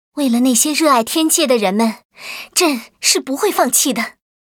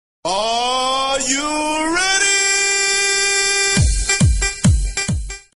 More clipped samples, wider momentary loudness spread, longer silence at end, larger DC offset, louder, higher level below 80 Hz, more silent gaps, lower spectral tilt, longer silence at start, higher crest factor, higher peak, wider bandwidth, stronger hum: neither; first, 10 LU vs 7 LU; first, 0.45 s vs 0.15 s; neither; about the same, -15 LUFS vs -16 LUFS; second, -66 dBFS vs -26 dBFS; first, 2.05-2.10 s vs none; about the same, -2 dB/octave vs -2.5 dB/octave; about the same, 0.15 s vs 0.25 s; about the same, 16 dB vs 14 dB; first, 0 dBFS vs -4 dBFS; first, over 20 kHz vs 11.5 kHz; neither